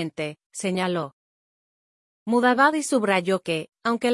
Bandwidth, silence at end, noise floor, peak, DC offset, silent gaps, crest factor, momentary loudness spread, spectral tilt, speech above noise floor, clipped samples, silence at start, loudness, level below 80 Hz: 12 kHz; 0 s; under -90 dBFS; -6 dBFS; under 0.1%; 0.46-0.50 s, 1.13-2.26 s; 20 dB; 13 LU; -4.5 dB/octave; over 67 dB; under 0.1%; 0 s; -23 LUFS; -72 dBFS